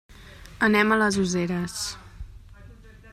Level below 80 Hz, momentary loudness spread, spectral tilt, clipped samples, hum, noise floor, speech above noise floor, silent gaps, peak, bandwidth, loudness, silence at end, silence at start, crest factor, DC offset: -48 dBFS; 25 LU; -4.5 dB/octave; under 0.1%; none; -47 dBFS; 24 dB; none; -6 dBFS; 14 kHz; -23 LUFS; 0 s; 0.1 s; 20 dB; under 0.1%